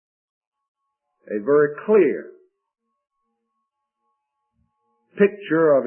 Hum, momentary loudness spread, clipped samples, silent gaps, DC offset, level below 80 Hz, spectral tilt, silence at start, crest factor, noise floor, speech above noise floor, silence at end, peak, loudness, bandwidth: none; 12 LU; under 0.1%; none; under 0.1%; -78 dBFS; -11.5 dB/octave; 1.3 s; 20 dB; -78 dBFS; 60 dB; 0 s; -4 dBFS; -19 LUFS; 3.3 kHz